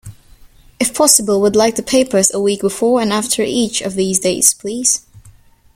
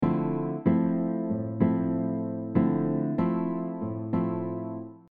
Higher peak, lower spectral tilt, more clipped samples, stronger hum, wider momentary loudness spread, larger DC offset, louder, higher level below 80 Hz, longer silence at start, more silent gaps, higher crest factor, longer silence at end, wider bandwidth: first, 0 dBFS vs -10 dBFS; second, -2.5 dB/octave vs -12.5 dB/octave; neither; neither; about the same, 7 LU vs 8 LU; neither; first, -14 LUFS vs -28 LUFS; first, -48 dBFS vs -62 dBFS; about the same, 0.05 s vs 0 s; neither; about the same, 16 dB vs 16 dB; first, 0.45 s vs 0.1 s; first, 17 kHz vs 3.6 kHz